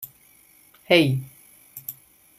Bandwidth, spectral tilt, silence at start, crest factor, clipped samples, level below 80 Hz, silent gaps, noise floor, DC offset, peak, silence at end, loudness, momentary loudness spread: 16 kHz; -5.5 dB/octave; 0 s; 24 dB; under 0.1%; -64 dBFS; none; -55 dBFS; under 0.1%; -2 dBFS; 0.45 s; -20 LUFS; 24 LU